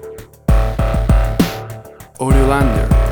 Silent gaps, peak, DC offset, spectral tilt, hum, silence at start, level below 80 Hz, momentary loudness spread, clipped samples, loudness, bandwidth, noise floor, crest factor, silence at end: none; 0 dBFS; under 0.1%; -7 dB/octave; none; 0 s; -16 dBFS; 16 LU; under 0.1%; -16 LUFS; 19.5 kHz; -33 dBFS; 14 dB; 0 s